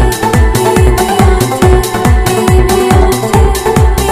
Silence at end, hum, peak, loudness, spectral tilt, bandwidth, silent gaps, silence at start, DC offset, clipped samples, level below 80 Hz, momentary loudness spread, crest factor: 0 s; none; 0 dBFS; -9 LUFS; -5.5 dB/octave; 16 kHz; none; 0 s; under 0.1%; 0.7%; -12 dBFS; 1 LU; 8 dB